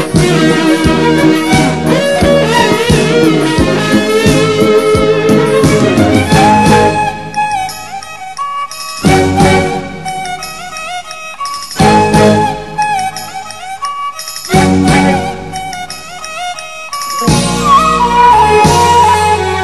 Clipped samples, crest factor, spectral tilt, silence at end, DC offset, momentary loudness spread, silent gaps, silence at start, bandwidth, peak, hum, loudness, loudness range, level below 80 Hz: 0.4%; 10 dB; -5 dB/octave; 0 s; 2%; 14 LU; none; 0 s; 13 kHz; 0 dBFS; none; -10 LUFS; 5 LU; -30 dBFS